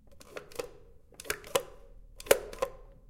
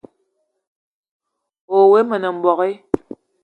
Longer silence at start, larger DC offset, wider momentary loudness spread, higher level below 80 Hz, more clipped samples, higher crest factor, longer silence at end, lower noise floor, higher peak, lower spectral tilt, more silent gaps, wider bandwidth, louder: second, 0.05 s vs 1.7 s; neither; first, 21 LU vs 13 LU; about the same, -54 dBFS vs -56 dBFS; neither; first, 34 dB vs 18 dB; second, 0.15 s vs 0.45 s; second, -54 dBFS vs -70 dBFS; about the same, -2 dBFS vs 0 dBFS; second, -1.5 dB/octave vs -7.5 dB/octave; neither; first, 17 kHz vs 4.4 kHz; second, -33 LUFS vs -17 LUFS